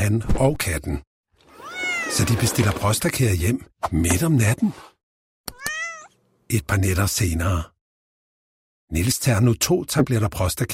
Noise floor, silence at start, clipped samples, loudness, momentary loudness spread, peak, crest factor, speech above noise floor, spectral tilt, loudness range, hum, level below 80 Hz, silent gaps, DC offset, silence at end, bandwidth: -50 dBFS; 0 s; under 0.1%; -22 LUFS; 12 LU; -4 dBFS; 18 dB; 29 dB; -5 dB/octave; 4 LU; none; -36 dBFS; 1.07-1.24 s, 5.03-5.44 s, 7.81-8.88 s; under 0.1%; 0 s; 16.5 kHz